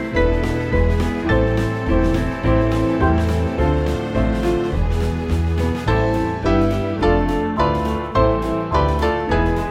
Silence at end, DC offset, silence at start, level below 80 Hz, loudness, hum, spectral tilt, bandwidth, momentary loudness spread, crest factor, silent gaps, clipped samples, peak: 0 s; under 0.1%; 0 s; -24 dBFS; -19 LUFS; none; -7.5 dB/octave; 13.5 kHz; 3 LU; 14 dB; none; under 0.1%; -4 dBFS